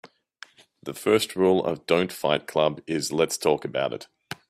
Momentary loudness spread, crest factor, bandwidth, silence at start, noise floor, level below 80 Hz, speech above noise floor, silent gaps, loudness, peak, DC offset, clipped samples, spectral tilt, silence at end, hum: 13 LU; 20 dB; 15.5 kHz; 0.05 s; -50 dBFS; -66 dBFS; 26 dB; none; -24 LUFS; -6 dBFS; under 0.1%; under 0.1%; -4 dB/octave; 0.15 s; none